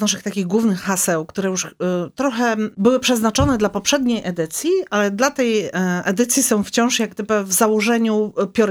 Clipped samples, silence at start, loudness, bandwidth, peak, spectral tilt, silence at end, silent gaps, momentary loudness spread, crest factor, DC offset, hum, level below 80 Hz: under 0.1%; 0 s; -18 LUFS; 17.5 kHz; -2 dBFS; -4 dB/octave; 0 s; none; 6 LU; 16 dB; under 0.1%; none; -44 dBFS